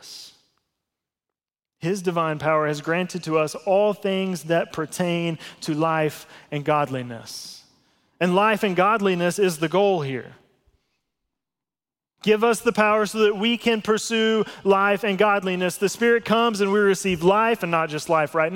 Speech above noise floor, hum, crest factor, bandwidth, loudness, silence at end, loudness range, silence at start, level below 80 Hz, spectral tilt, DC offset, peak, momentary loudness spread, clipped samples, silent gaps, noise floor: over 69 dB; none; 18 dB; 17 kHz; -22 LUFS; 0 s; 5 LU; 0.05 s; -62 dBFS; -5 dB/octave; under 0.1%; -4 dBFS; 10 LU; under 0.1%; none; under -90 dBFS